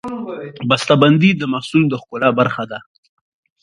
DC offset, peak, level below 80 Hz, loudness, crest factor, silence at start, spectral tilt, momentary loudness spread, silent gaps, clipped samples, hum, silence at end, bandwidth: under 0.1%; 0 dBFS; -58 dBFS; -16 LUFS; 16 dB; 0.05 s; -6.5 dB/octave; 16 LU; none; under 0.1%; none; 0.85 s; 11.5 kHz